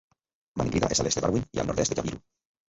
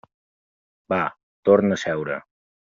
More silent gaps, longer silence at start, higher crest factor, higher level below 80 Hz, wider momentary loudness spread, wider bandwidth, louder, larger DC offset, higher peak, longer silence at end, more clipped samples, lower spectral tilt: second, none vs 1.23-1.43 s; second, 0.55 s vs 0.9 s; about the same, 20 dB vs 20 dB; first, -46 dBFS vs -64 dBFS; about the same, 12 LU vs 12 LU; about the same, 8.2 kHz vs 7.6 kHz; second, -27 LUFS vs -22 LUFS; neither; second, -10 dBFS vs -4 dBFS; about the same, 0.5 s vs 0.4 s; neither; about the same, -4.5 dB/octave vs -5 dB/octave